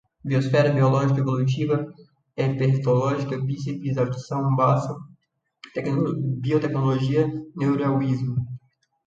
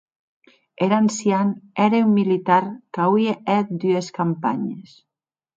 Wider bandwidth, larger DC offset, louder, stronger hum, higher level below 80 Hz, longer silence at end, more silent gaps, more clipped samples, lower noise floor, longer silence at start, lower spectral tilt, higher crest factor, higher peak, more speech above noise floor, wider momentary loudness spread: about the same, 7.6 kHz vs 7.8 kHz; neither; second, -23 LUFS vs -20 LUFS; neither; first, -58 dBFS vs -70 dBFS; second, 0.5 s vs 0.75 s; neither; neither; second, -66 dBFS vs -89 dBFS; second, 0.25 s vs 0.8 s; first, -8.5 dB/octave vs -6.5 dB/octave; about the same, 16 dB vs 18 dB; second, -6 dBFS vs -2 dBFS; second, 44 dB vs 69 dB; first, 10 LU vs 7 LU